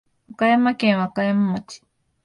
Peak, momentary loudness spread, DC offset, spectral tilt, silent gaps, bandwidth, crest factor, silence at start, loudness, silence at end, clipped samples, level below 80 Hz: -6 dBFS; 9 LU; under 0.1%; -6.5 dB/octave; none; 11 kHz; 14 dB; 0.3 s; -20 LUFS; 0.5 s; under 0.1%; -64 dBFS